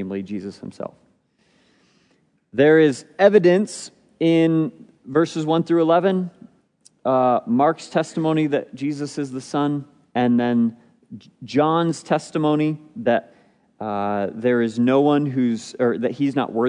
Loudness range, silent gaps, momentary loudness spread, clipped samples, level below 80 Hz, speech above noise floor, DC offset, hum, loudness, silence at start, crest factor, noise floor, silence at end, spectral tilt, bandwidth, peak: 4 LU; none; 13 LU; under 0.1%; -74 dBFS; 43 dB; under 0.1%; none; -20 LUFS; 0 s; 20 dB; -63 dBFS; 0 s; -6.5 dB/octave; 10.5 kHz; -2 dBFS